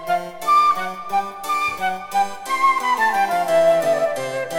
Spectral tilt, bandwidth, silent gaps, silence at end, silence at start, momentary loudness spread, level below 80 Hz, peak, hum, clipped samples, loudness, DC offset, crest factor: -3 dB/octave; 18 kHz; none; 0 s; 0 s; 8 LU; -60 dBFS; -6 dBFS; none; under 0.1%; -19 LUFS; under 0.1%; 12 dB